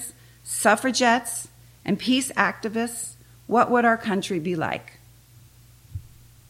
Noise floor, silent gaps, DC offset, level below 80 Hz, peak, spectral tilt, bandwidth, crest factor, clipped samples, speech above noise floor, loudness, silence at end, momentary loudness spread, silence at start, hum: -51 dBFS; none; under 0.1%; -56 dBFS; -4 dBFS; -3.5 dB/octave; 16.5 kHz; 22 dB; under 0.1%; 29 dB; -23 LUFS; 0.4 s; 21 LU; 0 s; none